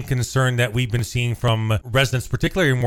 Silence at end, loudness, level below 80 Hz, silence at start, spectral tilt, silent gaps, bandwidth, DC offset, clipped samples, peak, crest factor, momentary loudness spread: 0 s; -21 LUFS; -38 dBFS; 0 s; -5 dB/octave; none; 16 kHz; under 0.1%; under 0.1%; -6 dBFS; 14 dB; 4 LU